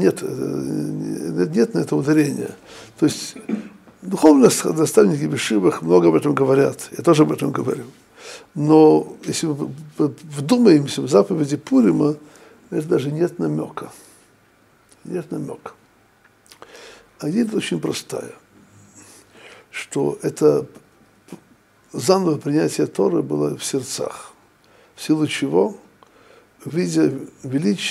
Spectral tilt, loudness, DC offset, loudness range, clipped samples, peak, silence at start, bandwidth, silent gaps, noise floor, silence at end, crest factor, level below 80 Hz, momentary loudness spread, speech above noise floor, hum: -5.5 dB/octave; -19 LUFS; under 0.1%; 10 LU; under 0.1%; 0 dBFS; 0 s; 15 kHz; none; -56 dBFS; 0 s; 20 dB; -64 dBFS; 17 LU; 37 dB; none